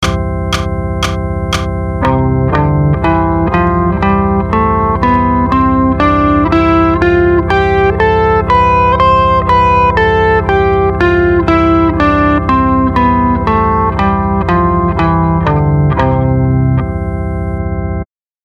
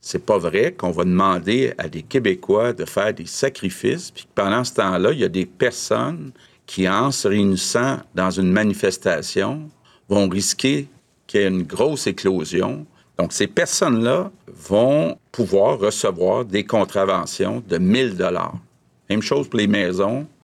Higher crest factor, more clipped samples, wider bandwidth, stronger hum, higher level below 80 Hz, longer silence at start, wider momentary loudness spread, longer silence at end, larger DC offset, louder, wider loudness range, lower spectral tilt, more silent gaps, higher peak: second, 10 dB vs 16 dB; neither; second, 11.5 kHz vs 15 kHz; neither; first, -22 dBFS vs -56 dBFS; about the same, 0 s vs 0.05 s; about the same, 7 LU vs 7 LU; first, 0.4 s vs 0.2 s; neither; first, -11 LUFS vs -20 LUFS; about the same, 3 LU vs 2 LU; first, -7.5 dB/octave vs -4.5 dB/octave; neither; first, 0 dBFS vs -4 dBFS